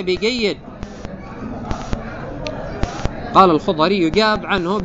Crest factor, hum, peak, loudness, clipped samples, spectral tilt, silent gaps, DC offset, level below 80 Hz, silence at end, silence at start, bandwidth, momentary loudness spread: 18 dB; none; 0 dBFS; -18 LUFS; under 0.1%; -5.5 dB/octave; none; under 0.1%; -34 dBFS; 0 s; 0 s; 8 kHz; 18 LU